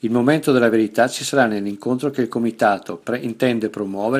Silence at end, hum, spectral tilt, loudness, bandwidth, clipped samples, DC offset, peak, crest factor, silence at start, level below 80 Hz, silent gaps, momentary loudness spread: 0 s; none; -5.5 dB/octave; -19 LUFS; 15 kHz; under 0.1%; under 0.1%; -2 dBFS; 18 dB; 0.05 s; -64 dBFS; none; 9 LU